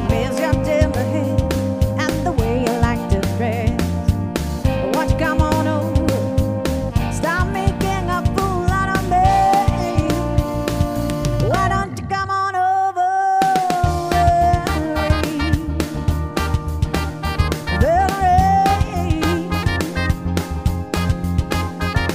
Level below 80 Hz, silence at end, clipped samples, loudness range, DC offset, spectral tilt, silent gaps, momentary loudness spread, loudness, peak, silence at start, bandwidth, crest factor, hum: -26 dBFS; 0 s; under 0.1%; 2 LU; under 0.1%; -6 dB/octave; none; 6 LU; -19 LUFS; -2 dBFS; 0 s; 16 kHz; 16 dB; none